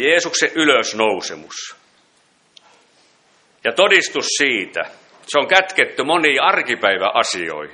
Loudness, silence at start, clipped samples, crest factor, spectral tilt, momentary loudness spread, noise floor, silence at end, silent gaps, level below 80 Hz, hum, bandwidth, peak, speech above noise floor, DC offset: -16 LUFS; 0 s; under 0.1%; 18 dB; -1.5 dB/octave; 14 LU; -58 dBFS; 0 s; none; -66 dBFS; none; 10.5 kHz; 0 dBFS; 41 dB; under 0.1%